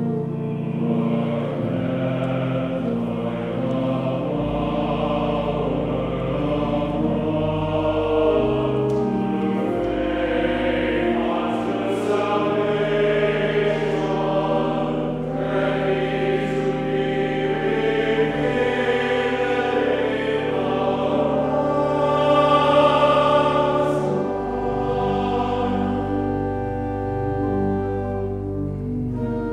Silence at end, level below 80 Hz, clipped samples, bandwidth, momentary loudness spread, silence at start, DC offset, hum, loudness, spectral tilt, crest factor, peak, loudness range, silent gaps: 0 s; -40 dBFS; under 0.1%; 11 kHz; 6 LU; 0 s; under 0.1%; none; -22 LUFS; -7.5 dB/octave; 16 dB; -4 dBFS; 5 LU; none